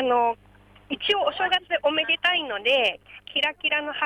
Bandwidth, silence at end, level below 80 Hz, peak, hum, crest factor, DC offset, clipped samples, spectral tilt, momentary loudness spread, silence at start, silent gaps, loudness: 13.5 kHz; 0 s; -62 dBFS; -10 dBFS; 50 Hz at -60 dBFS; 14 dB; under 0.1%; under 0.1%; -3 dB/octave; 8 LU; 0 s; none; -23 LUFS